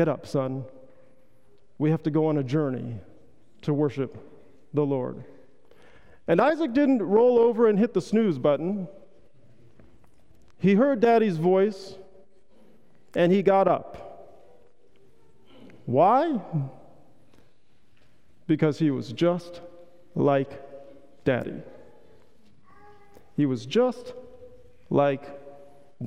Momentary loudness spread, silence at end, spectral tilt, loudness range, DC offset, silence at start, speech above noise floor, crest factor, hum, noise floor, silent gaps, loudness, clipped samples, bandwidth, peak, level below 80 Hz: 22 LU; 0 s; -8 dB/octave; 8 LU; 0.4%; 0 s; 42 dB; 18 dB; none; -65 dBFS; none; -24 LUFS; under 0.1%; 11 kHz; -8 dBFS; -64 dBFS